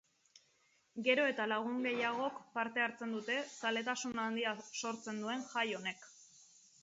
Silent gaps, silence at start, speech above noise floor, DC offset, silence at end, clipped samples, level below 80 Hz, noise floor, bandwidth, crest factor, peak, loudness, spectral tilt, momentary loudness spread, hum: none; 0.95 s; 36 dB; under 0.1%; 0.4 s; under 0.1%; -84 dBFS; -74 dBFS; 7.6 kHz; 22 dB; -16 dBFS; -37 LUFS; -1 dB/octave; 9 LU; none